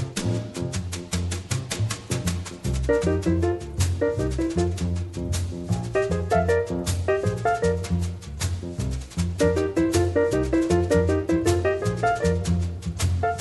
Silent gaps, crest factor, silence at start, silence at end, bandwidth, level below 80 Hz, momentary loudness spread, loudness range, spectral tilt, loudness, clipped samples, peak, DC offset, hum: none; 16 dB; 0 s; 0 s; 12 kHz; -36 dBFS; 8 LU; 3 LU; -6 dB/octave; -25 LUFS; under 0.1%; -8 dBFS; under 0.1%; none